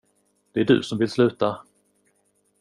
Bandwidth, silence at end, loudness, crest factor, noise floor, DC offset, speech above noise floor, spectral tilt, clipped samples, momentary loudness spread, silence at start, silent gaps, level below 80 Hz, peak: 11 kHz; 1 s; -22 LUFS; 20 dB; -68 dBFS; under 0.1%; 46 dB; -6.5 dB/octave; under 0.1%; 9 LU; 0.55 s; none; -62 dBFS; -4 dBFS